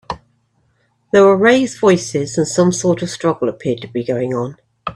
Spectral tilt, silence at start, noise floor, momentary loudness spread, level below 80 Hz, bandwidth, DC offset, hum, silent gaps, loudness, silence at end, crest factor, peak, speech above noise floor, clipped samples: -5 dB/octave; 0.1 s; -61 dBFS; 13 LU; -52 dBFS; 11 kHz; under 0.1%; none; none; -15 LUFS; 0 s; 16 dB; 0 dBFS; 46 dB; under 0.1%